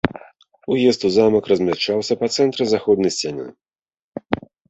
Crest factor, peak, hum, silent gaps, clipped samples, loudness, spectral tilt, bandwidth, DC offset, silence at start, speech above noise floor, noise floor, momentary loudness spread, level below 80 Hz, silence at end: 18 dB; -2 dBFS; none; 4.02-4.12 s; under 0.1%; -19 LUFS; -5 dB/octave; 8.2 kHz; under 0.1%; 0.05 s; 30 dB; -48 dBFS; 17 LU; -52 dBFS; 0.35 s